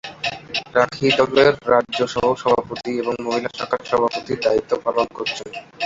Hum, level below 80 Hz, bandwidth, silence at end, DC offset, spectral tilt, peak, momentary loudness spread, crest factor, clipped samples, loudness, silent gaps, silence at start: none; -54 dBFS; 7.8 kHz; 0 s; under 0.1%; -4.5 dB/octave; -2 dBFS; 11 LU; 18 dB; under 0.1%; -20 LUFS; none; 0.05 s